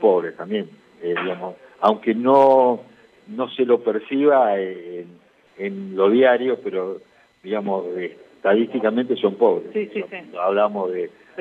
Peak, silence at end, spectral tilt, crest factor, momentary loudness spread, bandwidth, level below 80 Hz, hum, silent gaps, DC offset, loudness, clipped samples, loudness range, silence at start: -4 dBFS; 0 s; -7.5 dB/octave; 16 dB; 16 LU; 5.2 kHz; -74 dBFS; none; none; under 0.1%; -20 LUFS; under 0.1%; 4 LU; 0 s